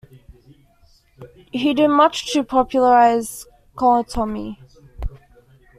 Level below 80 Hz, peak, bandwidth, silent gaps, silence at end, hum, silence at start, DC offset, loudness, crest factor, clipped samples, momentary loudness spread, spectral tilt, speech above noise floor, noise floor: -40 dBFS; -2 dBFS; 15 kHz; none; 0.65 s; none; 1.2 s; under 0.1%; -17 LUFS; 18 dB; under 0.1%; 20 LU; -4.5 dB/octave; 38 dB; -55 dBFS